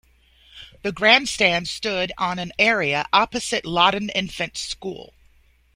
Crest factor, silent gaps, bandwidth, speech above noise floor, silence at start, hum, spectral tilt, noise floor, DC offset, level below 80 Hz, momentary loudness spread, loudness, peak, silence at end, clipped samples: 22 dB; none; 16 kHz; 35 dB; 0.55 s; none; -3 dB/octave; -57 dBFS; under 0.1%; -52 dBFS; 14 LU; -20 LUFS; 0 dBFS; 0.7 s; under 0.1%